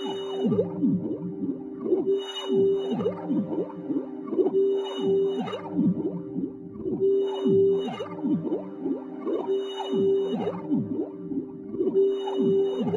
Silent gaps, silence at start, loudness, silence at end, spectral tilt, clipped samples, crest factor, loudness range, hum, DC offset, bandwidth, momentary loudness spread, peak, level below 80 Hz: none; 0 s; -27 LUFS; 0 s; -8 dB/octave; under 0.1%; 14 dB; 2 LU; none; under 0.1%; 7.4 kHz; 9 LU; -12 dBFS; -66 dBFS